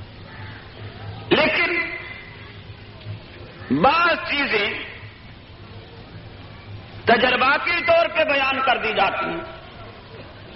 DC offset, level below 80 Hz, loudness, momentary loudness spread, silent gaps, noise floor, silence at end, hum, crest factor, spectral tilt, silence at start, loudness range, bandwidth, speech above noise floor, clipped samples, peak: under 0.1%; -48 dBFS; -19 LUFS; 23 LU; none; -42 dBFS; 0 s; none; 20 dB; -1.5 dB/octave; 0 s; 5 LU; 6 kHz; 23 dB; under 0.1%; -2 dBFS